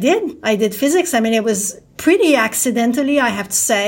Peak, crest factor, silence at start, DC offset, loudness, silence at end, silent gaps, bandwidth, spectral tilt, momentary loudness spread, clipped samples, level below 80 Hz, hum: -2 dBFS; 14 dB; 0 s; under 0.1%; -16 LUFS; 0 s; none; 16.5 kHz; -3 dB/octave; 6 LU; under 0.1%; -56 dBFS; none